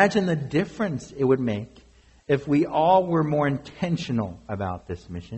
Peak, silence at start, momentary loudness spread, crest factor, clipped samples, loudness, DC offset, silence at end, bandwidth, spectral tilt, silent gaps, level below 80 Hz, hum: -6 dBFS; 0 s; 13 LU; 18 dB; under 0.1%; -24 LUFS; under 0.1%; 0 s; 8.2 kHz; -7 dB/octave; none; -54 dBFS; none